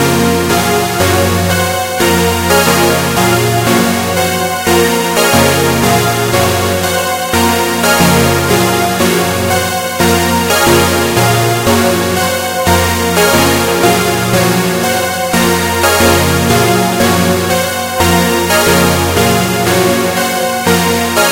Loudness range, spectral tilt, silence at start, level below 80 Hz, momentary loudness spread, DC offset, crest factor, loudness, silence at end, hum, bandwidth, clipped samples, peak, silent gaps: 1 LU; -4 dB/octave; 0 s; -34 dBFS; 4 LU; under 0.1%; 10 dB; -10 LUFS; 0 s; none; 17 kHz; 0.1%; 0 dBFS; none